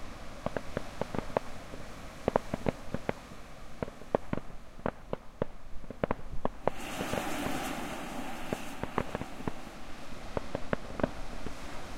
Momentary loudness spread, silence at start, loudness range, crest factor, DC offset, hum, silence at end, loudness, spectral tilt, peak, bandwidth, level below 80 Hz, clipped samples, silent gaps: 12 LU; 0 s; 2 LU; 28 dB; under 0.1%; none; 0 s; -38 LUFS; -5.5 dB/octave; -8 dBFS; 16 kHz; -46 dBFS; under 0.1%; none